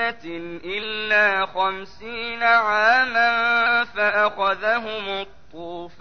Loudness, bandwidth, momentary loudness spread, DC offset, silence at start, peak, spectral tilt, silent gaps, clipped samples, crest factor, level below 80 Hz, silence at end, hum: -20 LUFS; 6.6 kHz; 17 LU; 0.8%; 0 s; -6 dBFS; -3.5 dB/octave; none; under 0.1%; 16 dB; -56 dBFS; 0.1 s; none